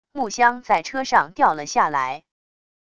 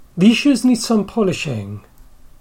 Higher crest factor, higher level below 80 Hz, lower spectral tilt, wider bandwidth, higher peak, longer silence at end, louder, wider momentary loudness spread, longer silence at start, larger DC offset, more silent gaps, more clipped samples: about the same, 20 dB vs 16 dB; second, -60 dBFS vs -46 dBFS; second, -3 dB/octave vs -5 dB/octave; second, 10.5 kHz vs 16.5 kHz; about the same, -2 dBFS vs -2 dBFS; first, 0.8 s vs 0.6 s; second, -20 LUFS vs -16 LUFS; second, 10 LU vs 16 LU; first, 0.15 s vs 0 s; first, 0.5% vs under 0.1%; neither; neither